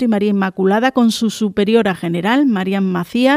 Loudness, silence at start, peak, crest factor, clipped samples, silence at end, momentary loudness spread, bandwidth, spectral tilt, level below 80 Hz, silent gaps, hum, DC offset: -16 LUFS; 0 s; 0 dBFS; 14 dB; under 0.1%; 0 s; 4 LU; 15 kHz; -6 dB/octave; -54 dBFS; none; none; under 0.1%